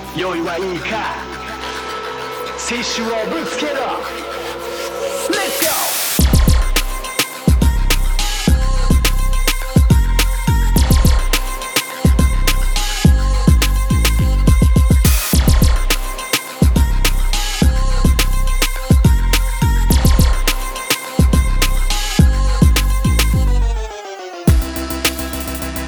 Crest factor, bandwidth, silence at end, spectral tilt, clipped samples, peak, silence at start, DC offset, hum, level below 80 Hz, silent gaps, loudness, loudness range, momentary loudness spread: 14 dB; over 20 kHz; 0 s; -4.5 dB/octave; under 0.1%; 0 dBFS; 0 s; under 0.1%; none; -16 dBFS; none; -16 LUFS; 7 LU; 9 LU